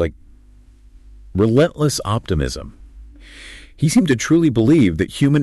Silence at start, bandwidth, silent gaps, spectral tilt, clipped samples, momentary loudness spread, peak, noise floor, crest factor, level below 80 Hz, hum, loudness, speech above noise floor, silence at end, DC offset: 0 s; 12.5 kHz; none; -6 dB/octave; under 0.1%; 23 LU; -6 dBFS; -46 dBFS; 12 dB; -38 dBFS; none; -17 LUFS; 30 dB; 0 s; under 0.1%